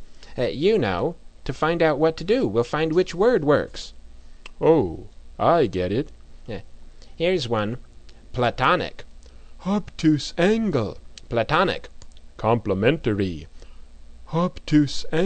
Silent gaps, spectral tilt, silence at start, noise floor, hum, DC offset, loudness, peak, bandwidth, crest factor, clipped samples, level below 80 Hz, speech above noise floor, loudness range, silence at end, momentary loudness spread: none; -6.5 dB/octave; 0 s; -41 dBFS; none; under 0.1%; -22 LUFS; -4 dBFS; 9 kHz; 18 dB; under 0.1%; -42 dBFS; 20 dB; 4 LU; 0 s; 17 LU